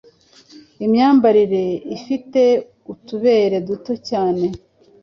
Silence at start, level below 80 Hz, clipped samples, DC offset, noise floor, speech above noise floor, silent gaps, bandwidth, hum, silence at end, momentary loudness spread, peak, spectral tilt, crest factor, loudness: 0.8 s; -56 dBFS; under 0.1%; under 0.1%; -49 dBFS; 32 dB; none; 7 kHz; none; 0.45 s; 14 LU; -2 dBFS; -7 dB/octave; 14 dB; -17 LUFS